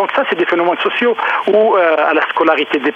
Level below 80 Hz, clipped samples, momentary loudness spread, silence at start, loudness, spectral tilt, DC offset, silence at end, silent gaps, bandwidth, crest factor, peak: -72 dBFS; under 0.1%; 3 LU; 0 s; -13 LUFS; -5.5 dB/octave; under 0.1%; 0 s; none; 7.8 kHz; 14 dB; 0 dBFS